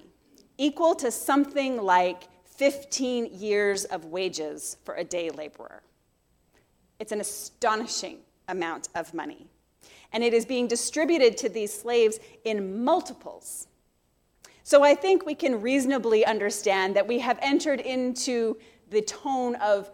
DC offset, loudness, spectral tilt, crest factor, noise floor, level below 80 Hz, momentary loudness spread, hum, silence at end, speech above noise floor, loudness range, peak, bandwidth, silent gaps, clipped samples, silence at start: under 0.1%; -26 LUFS; -3 dB/octave; 20 dB; -69 dBFS; -68 dBFS; 15 LU; none; 0 s; 43 dB; 9 LU; -6 dBFS; 17.5 kHz; none; under 0.1%; 0.6 s